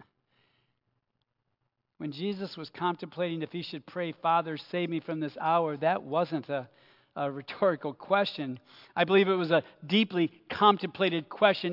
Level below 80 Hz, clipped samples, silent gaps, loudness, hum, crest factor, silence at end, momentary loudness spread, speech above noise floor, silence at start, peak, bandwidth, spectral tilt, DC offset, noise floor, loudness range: -80 dBFS; under 0.1%; none; -29 LUFS; none; 22 dB; 0 s; 13 LU; 52 dB; 2 s; -8 dBFS; 5.8 kHz; -7.5 dB/octave; under 0.1%; -81 dBFS; 9 LU